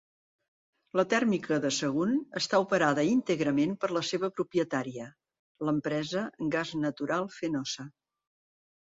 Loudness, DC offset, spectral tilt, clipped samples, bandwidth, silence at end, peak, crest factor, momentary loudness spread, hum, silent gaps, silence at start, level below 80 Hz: -30 LUFS; under 0.1%; -5 dB/octave; under 0.1%; 7.8 kHz; 0.95 s; -12 dBFS; 18 dB; 8 LU; none; 5.39-5.55 s; 0.95 s; -70 dBFS